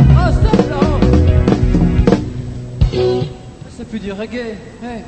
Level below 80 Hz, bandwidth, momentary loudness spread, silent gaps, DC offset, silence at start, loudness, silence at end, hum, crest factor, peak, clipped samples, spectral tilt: -20 dBFS; 8.8 kHz; 16 LU; none; under 0.1%; 0 s; -14 LUFS; 0 s; none; 14 dB; 0 dBFS; under 0.1%; -8 dB/octave